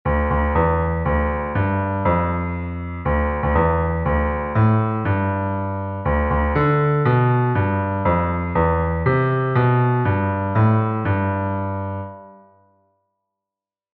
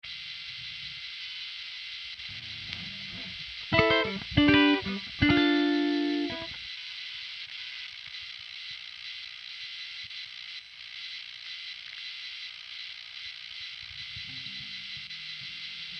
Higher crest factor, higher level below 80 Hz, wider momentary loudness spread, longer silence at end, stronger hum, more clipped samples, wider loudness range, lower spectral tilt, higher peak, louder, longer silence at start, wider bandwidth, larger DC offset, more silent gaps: second, 14 dB vs 26 dB; first, -30 dBFS vs -54 dBFS; second, 7 LU vs 16 LU; first, 1.6 s vs 0 s; neither; neither; second, 3 LU vs 14 LU; first, -8 dB/octave vs -5.5 dB/octave; about the same, -6 dBFS vs -6 dBFS; first, -20 LUFS vs -31 LUFS; about the same, 0.05 s vs 0.05 s; second, 4.4 kHz vs 6.6 kHz; neither; neither